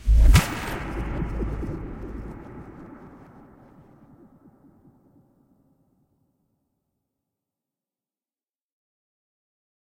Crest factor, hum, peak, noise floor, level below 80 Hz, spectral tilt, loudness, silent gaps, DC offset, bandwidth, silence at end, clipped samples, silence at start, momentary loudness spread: 24 dB; none; -2 dBFS; under -90 dBFS; -28 dBFS; -5.5 dB/octave; -25 LUFS; none; under 0.1%; 16.5 kHz; 6.8 s; under 0.1%; 0 s; 27 LU